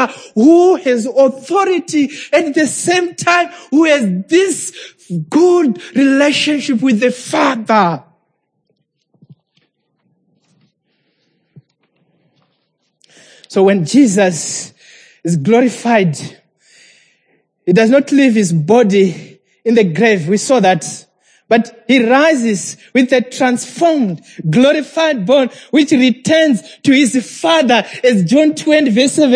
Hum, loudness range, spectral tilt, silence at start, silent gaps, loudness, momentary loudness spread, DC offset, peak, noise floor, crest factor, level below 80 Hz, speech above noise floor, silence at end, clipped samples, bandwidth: none; 5 LU; -5 dB/octave; 0 s; none; -12 LUFS; 9 LU; under 0.1%; 0 dBFS; -66 dBFS; 14 dB; -66 dBFS; 54 dB; 0 s; under 0.1%; 10.5 kHz